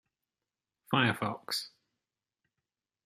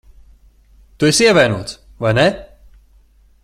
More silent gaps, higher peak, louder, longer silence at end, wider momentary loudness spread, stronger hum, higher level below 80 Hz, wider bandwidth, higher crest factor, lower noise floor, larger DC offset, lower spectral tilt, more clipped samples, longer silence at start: neither; second, -12 dBFS vs 0 dBFS; second, -32 LUFS vs -14 LUFS; first, 1.35 s vs 1 s; second, 8 LU vs 16 LU; neither; second, -76 dBFS vs -44 dBFS; about the same, 15 kHz vs 15 kHz; first, 26 dB vs 18 dB; first, under -90 dBFS vs -50 dBFS; neither; about the same, -4.5 dB/octave vs -4 dB/octave; neither; about the same, 0.9 s vs 1 s